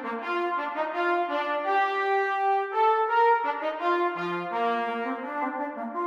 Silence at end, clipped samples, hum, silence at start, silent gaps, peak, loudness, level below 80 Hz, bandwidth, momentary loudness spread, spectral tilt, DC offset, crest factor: 0 s; under 0.1%; none; 0 s; none; -10 dBFS; -26 LUFS; -82 dBFS; 7.8 kHz; 8 LU; -5.5 dB/octave; under 0.1%; 16 dB